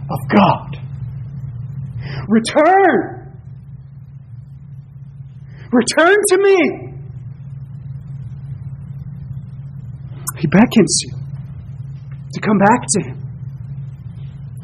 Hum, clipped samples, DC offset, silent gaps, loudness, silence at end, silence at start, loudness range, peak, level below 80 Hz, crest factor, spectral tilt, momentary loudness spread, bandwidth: none; under 0.1%; under 0.1%; none; -15 LUFS; 0 s; 0 s; 7 LU; 0 dBFS; -44 dBFS; 18 dB; -5 dB/octave; 24 LU; 13 kHz